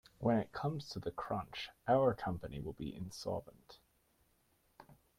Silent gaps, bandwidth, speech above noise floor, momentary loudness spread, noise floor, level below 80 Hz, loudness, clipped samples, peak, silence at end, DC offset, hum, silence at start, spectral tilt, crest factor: none; 16 kHz; 37 dB; 13 LU; -75 dBFS; -62 dBFS; -38 LUFS; under 0.1%; -20 dBFS; 0.25 s; under 0.1%; none; 0.2 s; -6.5 dB/octave; 20 dB